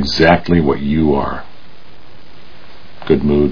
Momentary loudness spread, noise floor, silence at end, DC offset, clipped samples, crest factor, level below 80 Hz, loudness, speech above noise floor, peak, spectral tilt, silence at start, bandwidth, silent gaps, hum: 14 LU; -43 dBFS; 0 s; 6%; under 0.1%; 16 dB; -32 dBFS; -14 LUFS; 30 dB; 0 dBFS; -7 dB/octave; 0 s; 5.4 kHz; none; none